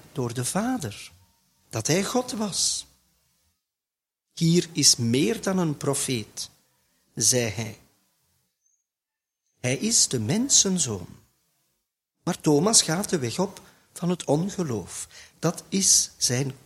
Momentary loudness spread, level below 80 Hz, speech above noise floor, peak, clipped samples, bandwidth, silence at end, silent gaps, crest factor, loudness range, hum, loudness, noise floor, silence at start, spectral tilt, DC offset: 17 LU; -60 dBFS; 65 dB; -4 dBFS; under 0.1%; 16 kHz; 0.1 s; none; 22 dB; 6 LU; none; -23 LUFS; -89 dBFS; 0.15 s; -3 dB/octave; under 0.1%